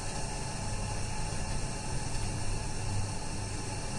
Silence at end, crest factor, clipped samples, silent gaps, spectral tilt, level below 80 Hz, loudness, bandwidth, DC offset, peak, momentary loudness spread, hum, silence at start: 0 s; 12 dB; under 0.1%; none; -4 dB/octave; -38 dBFS; -36 LUFS; 11.5 kHz; under 0.1%; -20 dBFS; 1 LU; none; 0 s